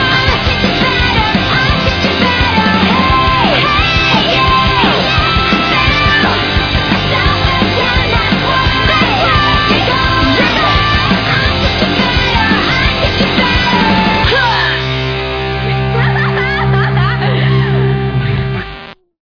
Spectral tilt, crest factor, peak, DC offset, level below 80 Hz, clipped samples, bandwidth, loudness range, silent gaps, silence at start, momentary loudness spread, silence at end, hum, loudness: -6 dB/octave; 12 dB; 0 dBFS; under 0.1%; -22 dBFS; under 0.1%; 5.4 kHz; 3 LU; none; 0 s; 4 LU; 0.35 s; none; -10 LUFS